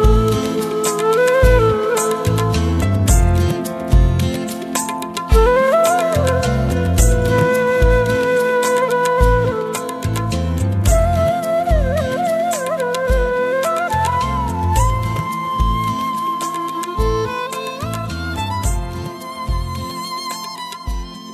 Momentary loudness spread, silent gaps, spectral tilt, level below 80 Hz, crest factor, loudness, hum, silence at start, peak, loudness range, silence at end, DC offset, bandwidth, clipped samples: 10 LU; none; -5.5 dB/octave; -22 dBFS; 16 dB; -17 LUFS; none; 0 s; 0 dBFS; 7 LU; 0 s; under 0.1%; 14 kHz; under 0.1%